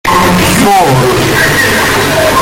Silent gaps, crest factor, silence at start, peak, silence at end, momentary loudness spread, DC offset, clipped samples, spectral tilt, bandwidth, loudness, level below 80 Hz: none; 8 dB; 0.05 s; 0 dBFS; 0 s; 2 LU; under 0.1%; under 0.1%; -4 dB/octave; 17.5 kHz; -7 LUFS; -28 dBFS